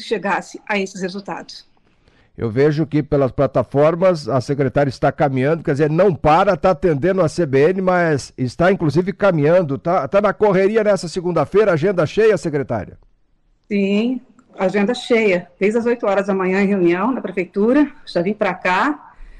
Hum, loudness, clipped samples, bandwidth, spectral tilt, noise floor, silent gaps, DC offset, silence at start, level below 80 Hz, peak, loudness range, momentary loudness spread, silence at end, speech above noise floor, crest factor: none; -17 LUFS; under 0.1%; 11 kHz; -7 dB/octave; -59 dBFS; none; under 0.1%; 0 s; -46 dBFS; -6 dBFS; 4 LU; 8 LU; 0.1 s; 42 dB; 10 dB